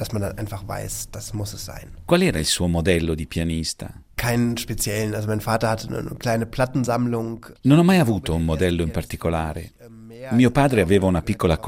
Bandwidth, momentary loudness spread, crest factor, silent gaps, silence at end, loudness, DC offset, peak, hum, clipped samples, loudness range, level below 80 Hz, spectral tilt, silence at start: 16 kHz; 14 LU; 20 dB; none; 0 s; -22 LUFS; under 0.1%; -2 dBFS; none; under 0.1%; 3 LU; -40 dBFS; -5.5 dB/octave; 0 s